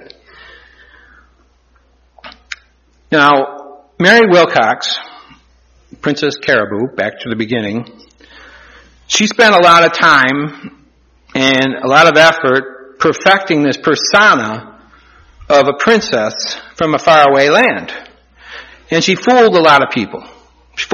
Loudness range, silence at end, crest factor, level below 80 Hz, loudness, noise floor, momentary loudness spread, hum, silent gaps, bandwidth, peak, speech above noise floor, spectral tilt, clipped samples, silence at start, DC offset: 8 LU; 0 s; 12 dB; -50 dBFS; -10 LUFS; -52 dBFS; 17 LU; none; none; 13.5 kHz; 0 dBFS; 41 dB; -3.5 dB/octave; 0.3%; 2.25 s; under 0.1%